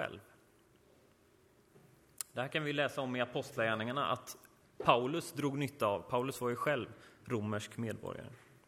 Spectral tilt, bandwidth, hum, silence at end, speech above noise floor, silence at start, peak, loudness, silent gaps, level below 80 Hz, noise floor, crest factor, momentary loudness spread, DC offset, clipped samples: -5 dB/octave; 16 kHz; none; 0.3 s; 31 dB; 0 s; -12 dBFS; -36 LUFS; none; -70 dBFS; -67 dBFS; 26 dB; 15 LU; under 0.1%; under 0.1%